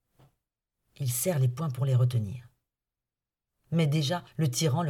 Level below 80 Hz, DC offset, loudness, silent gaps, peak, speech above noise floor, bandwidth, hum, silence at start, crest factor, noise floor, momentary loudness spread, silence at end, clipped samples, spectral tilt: -66 dBFS; under 0.1%; -28 LUFS; none; -16 dBFS; over 63 dB; 17 kHz; none; 1 s; 14 dB; under -90 dBFS; 8 LU; 0 s; under 0.1%; -5.5 dB/octave